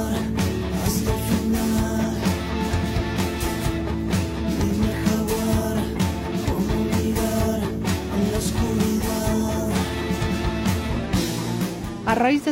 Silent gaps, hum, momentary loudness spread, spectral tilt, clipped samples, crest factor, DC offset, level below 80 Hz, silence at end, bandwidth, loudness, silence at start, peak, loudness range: none; none; 3 LU; -5.5 dB/octave; under 0.1%; 14 dB; under 0.1%; -32 dBFS; 0 s; 16.5 kHz; -23 LUFS; 0 s; -8 dBFS; 1 LU